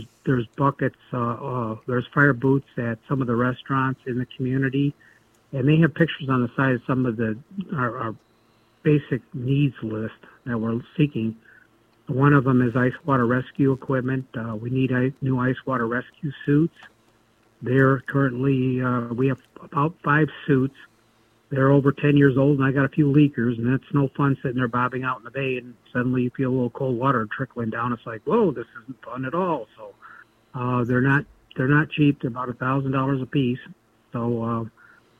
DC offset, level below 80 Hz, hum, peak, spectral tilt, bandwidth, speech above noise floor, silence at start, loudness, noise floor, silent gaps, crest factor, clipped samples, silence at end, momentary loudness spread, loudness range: under 0.1%; -58 dBFS; none; -4 dBFS; -9.5 dB/octave; 3.7 kHz; 38 dB; 0 s; -23 LUFS; -61 dBFS; none; 20 dB; under 0.1%; 0.5 s; 11 LU; 5 LU